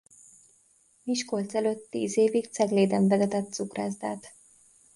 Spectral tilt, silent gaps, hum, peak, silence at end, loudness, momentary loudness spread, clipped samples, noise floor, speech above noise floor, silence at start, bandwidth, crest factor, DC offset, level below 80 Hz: -5.5 dB/octave; none; none; -10 dBFS; 0.65 s; -27 LUFS; 11 LU; under 0.1%; -64 dBFS; 37 dB; 1.05 s; 11.5 kHz; 18 dB; under 0.1%; -72 dBFS